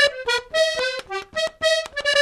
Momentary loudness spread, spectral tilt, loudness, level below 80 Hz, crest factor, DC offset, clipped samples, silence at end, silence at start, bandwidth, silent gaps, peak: 7 LU; 0 dB/octave; -22 LUFS; -54 dBFS; 16 dB; under 0.1%; under 0.1%; 0 s; 0 s; 14 kHz; none; -6 dBFS